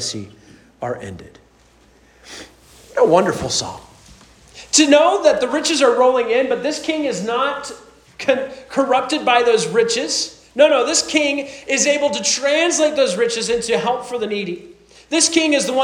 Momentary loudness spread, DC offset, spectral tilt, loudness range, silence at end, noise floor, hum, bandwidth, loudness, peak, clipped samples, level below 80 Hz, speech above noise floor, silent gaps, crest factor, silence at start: 15 LU; under 0.1%; -2.5 dB/octave; 6 LU; 0 s; -52 dBFS; none; 14.5 kHz; -17 LUFS; 0 dBFS; under 0.1%; -54 dBFS; 35 dB; none; 18 dB; 0 s